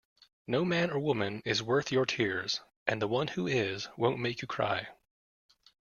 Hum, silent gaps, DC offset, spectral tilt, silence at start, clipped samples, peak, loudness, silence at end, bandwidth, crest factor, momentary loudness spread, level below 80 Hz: none; 2.76-2.86 s; under 0.1%; -5 dB/octave; 0.5 s; under 0.1%; -12 dBFS; -31 LUFS; 1.05 s; 7.2 kHz; 22 dB; 6 LU; -68 dBFS